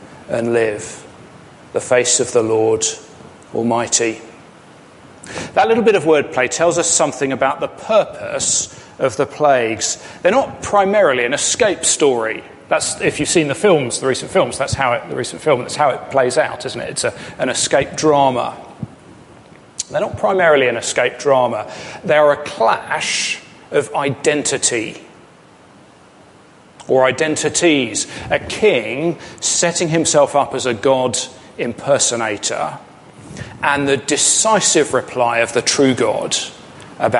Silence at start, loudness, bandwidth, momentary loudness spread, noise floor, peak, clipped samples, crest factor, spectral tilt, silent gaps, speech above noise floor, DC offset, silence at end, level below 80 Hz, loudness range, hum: 0 s; -16 LUFS; 11.5 kHz; 12 LU; -45 dBFS; 0 dBFS; under 0.1%; 16 dB; -3 dB/octave; none; 29 dB; under 0.1%; 0 s; -50 dBFS; 4 LU; none